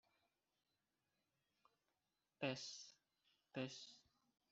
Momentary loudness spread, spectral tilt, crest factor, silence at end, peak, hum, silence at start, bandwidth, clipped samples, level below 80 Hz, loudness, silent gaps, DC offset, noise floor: 16 LU; -3.5 dB/octave; 28 dB; 0.5 s; -28 dBFS; none; 2.4 s; 8 kHz; under 0.1%; under -90 dBFS; -50 LUFS; none; under 0.1%; under -90 dBFS